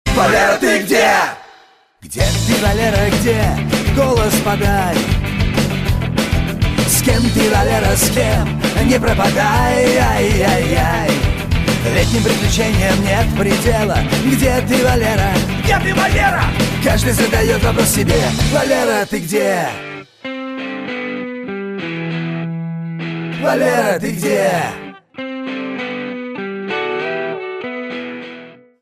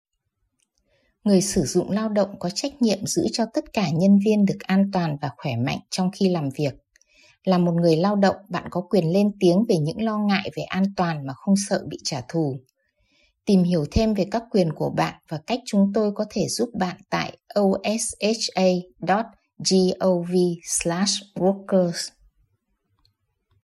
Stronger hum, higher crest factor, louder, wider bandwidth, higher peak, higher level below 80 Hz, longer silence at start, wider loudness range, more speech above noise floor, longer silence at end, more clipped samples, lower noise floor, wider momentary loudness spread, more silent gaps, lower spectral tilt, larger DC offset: neither; about the same, 14 dB vs 18 dB; first, -15 LUFS vs -23 LUFS; first, 15.5 kHz vs 13.5 kHz; first, -2 dBFS vs -6 dBFS; first, -26 dBFS vs -50 dBFS; second, 0.05 s vs 1.25 s; first, 8 LU vs 3 LU; second, 34 dB vs 53 dB; second, 0.3 s vs 1.55 s; neither; second, -48 dBFS vs -75 dBFS; first, 12 LU vs 9 LU; neither; about the same, -4.5 dB/octave vs -5.5 dB/octave; neither